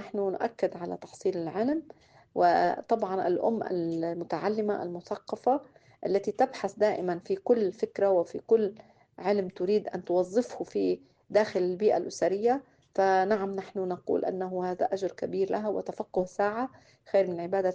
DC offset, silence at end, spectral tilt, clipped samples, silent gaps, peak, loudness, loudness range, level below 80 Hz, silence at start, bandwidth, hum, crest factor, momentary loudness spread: under 0.1%; 0 s; -6.5 dB/octave; under 0.1%; none; -12 dBFS; -29 LUFS; 3 LU; -72 dBFS; 0 s; 9 kHz; none; 16 dB; 8 LU